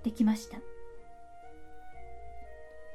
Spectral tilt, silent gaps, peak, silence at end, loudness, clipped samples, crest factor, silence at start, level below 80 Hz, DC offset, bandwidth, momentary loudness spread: -6 dB/octave; none; -16 dBFS; 0 s; -32 LUFS; under 0.1%; 20 dB; 0 s; -56 dBFS; under 0.1%; 14 kHz; 24 LU